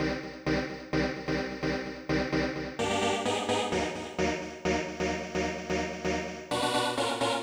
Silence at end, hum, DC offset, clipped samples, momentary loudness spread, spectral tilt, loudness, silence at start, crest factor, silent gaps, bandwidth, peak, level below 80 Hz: 0 s; none; under 0.1%; under 0.1%; 5 LU; -4.5 dB/octave; -31 LUFS; 0 s; 16 dB; none; over 20 kHz; -16 dBFS; -48 dBFS